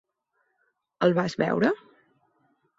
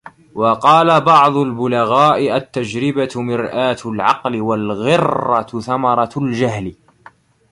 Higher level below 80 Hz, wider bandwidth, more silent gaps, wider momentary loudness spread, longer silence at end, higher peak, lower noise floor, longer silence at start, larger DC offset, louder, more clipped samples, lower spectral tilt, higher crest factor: second, -66 dBFS vs -52 dBFS; second, 8 kHz vs 11.5 kHz; neither; second, 3 LU vs 9 LU; first, 1 s vs 0.8 s; second, -8 dBFS vs 0 dBFS; first, -75 dBFS vs -46 dBFS; first, 1 s vs 0.05 s; neither; second, -25 LUFS vs -15 LUFS; neither; about the same, -7 dB/octave vs -6 dB/octave; about the same, 20 dB vs 16 dB